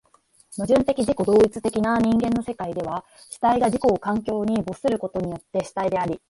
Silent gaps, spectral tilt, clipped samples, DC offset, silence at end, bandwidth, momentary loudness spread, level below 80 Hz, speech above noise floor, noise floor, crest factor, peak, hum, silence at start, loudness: none; -6.5 dB/octave; under 0.1%; under 0.1%; 0.1 s; 11.5 kHz; 10 LU; -50 dBFS; 37 dB; -59 dBFS; 16 dB; -6 dBFS; none; 0.5 s; -23 LUFS